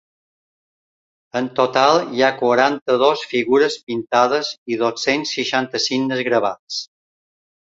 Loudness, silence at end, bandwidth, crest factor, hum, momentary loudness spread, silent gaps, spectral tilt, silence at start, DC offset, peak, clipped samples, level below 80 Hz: -18 LUFS; 0.8 s; 7.8 kHz; 18 dB; none; 10 LU; 2.82-2.86 s, 3.83-3.87 s, 4.58-4.66 s, 6.59-6.67 s; -3.5 dB/octave; 1.35 s; under 0.1%; 0 dBFS; under 0.1%; -64 dBFS